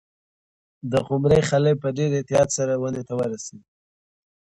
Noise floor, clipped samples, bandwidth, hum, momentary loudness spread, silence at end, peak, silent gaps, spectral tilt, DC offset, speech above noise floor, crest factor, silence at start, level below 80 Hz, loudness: under -90 dBFS; under 0.1%; 11 kHz; none; 10 LU; 0.85 s; -6 dBFS; none; -6 dB/octave; under 0.1%; over 68 dB; 18 dB; 0.85 s; -50 dBFS; -22 LUFS